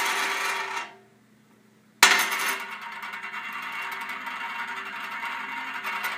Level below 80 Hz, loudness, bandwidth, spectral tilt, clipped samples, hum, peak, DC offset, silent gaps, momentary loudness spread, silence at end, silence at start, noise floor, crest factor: -78 dBFS; -26 LUFS; 15.5 kHz; 1 dB/octave; under 0.1%; none; 0 dBFS; under 0.1%; none; 16 LU; 0 s; 0 s; -58 dBFS; 30 dB